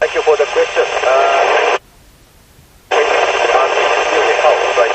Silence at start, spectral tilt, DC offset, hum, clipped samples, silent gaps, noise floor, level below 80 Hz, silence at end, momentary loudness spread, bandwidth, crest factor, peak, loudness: 0 s; -1 dB/octave; under 0.1%; none; under 0.1%; none; -45 dBFS; -48 dBFS; 0 s; 3 LU; 8.8 kHz; 14 dB; 0 dBFS; -13 LUFS